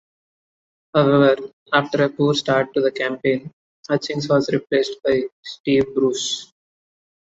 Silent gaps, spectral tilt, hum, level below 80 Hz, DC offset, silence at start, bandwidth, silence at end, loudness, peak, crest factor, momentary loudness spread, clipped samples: 1.53-1.66 s, 3.53-3.83 s, 5.32-5.43 s, 5.60-5.64 s; -5 dB/octave; none; -60 dBFS; under 0.1%; 0.95 s; 8 kHz; 0.95 s; -20 LUFS; -2 dBFS; 18 dB; 8 LU; under 0.1%